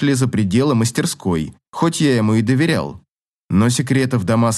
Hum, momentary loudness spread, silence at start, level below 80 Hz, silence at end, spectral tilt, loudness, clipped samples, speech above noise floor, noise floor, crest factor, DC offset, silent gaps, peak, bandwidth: none; 6 LU; 0 s; -52 dBFS; 0 s; -5.5 dB/octave; -17 LUFS; under 0.1%; 26 dB; -42 dBFS; 14 dB; under 0.1%; 1.69-1.73 s, 3.11-3.18 s, 3.28-3.49 s; -4 dBFS; 12.5 kHz